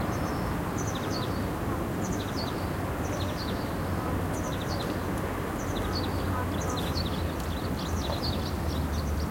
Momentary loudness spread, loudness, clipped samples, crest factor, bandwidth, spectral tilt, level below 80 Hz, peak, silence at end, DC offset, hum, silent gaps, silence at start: 2 LU; -31 LUFS; under 0.1%; 14 dB; 16.5 kHz; -5.5 dB/octave; -40 dBFS; -16 dBFS; 0 s; under 0.1%; none; none; 0 s